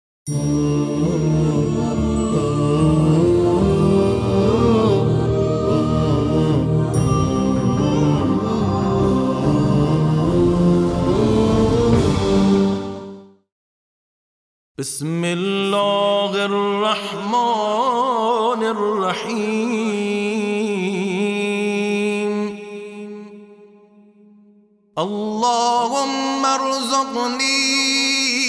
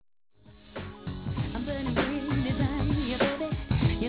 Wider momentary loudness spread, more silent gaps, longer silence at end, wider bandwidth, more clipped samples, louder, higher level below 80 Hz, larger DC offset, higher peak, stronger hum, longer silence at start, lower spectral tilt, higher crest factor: second, 7 LU vs 12 LU; first, 13.52-14.75 s vs none; about the same, 0 s vs 0 s; first, 11 kHz vs 4 kHz; neither; first, -18 LUFS vs -30 LUFS; about the same, -36 dBFS vs -38 dBFS; neither; first, -4 dBFS vs -14 dBFS; neither; second, 0.25 s vs 0.5 s; second, -5.5 dB/octave vs -11 dB/octave; about the same, 14 dB vs 16 dB